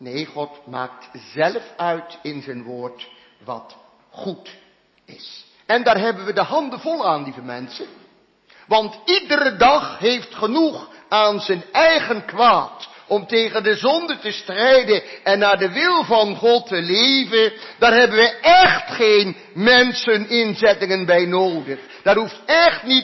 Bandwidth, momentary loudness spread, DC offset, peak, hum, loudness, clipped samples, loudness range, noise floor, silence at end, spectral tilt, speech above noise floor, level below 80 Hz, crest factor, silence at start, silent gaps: 6.2 kHz; 18 LU; under 0.1%; -2 dBFS; none; -17 LUFS; under 0.1%; 13 LU; -54 dBFS; 0 s; -4 dB/octave; 36 dB; -56 dBFS; 16 dB; 0 s; none